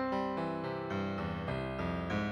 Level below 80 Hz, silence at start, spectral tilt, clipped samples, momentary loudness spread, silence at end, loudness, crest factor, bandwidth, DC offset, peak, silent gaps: -52 dBFS; 0 s; -7.5 dB/octave; under 0.1%; 2 LU; 0 s; -37 LUFS; 12 dB; 11 kHz; under 0.1%; -24 dBFS; none